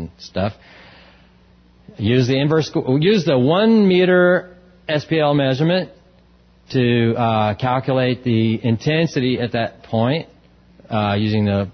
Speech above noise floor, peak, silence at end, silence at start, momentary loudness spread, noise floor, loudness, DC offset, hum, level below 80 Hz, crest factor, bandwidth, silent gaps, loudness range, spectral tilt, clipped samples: 34 dB; -4 dBFS; 0 s; 0 s; 11 LU; -51 dBFS; -18 LUFS; under 0.1%; none; -48 dBFS; 14 dB; 6.6 kHz; none; 4 LU; -7.5 dB/octave; under 0.1%